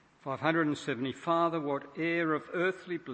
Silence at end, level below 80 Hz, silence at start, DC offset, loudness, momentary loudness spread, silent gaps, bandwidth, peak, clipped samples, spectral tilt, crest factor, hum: 0 s; -76 dBFS; 0.25 s; under 0.1%; -32 LUFS; 6 LU; none; 8.6 kHz; -12 dBFS; under 0.1%; -6 dB/octave; 20 dB; none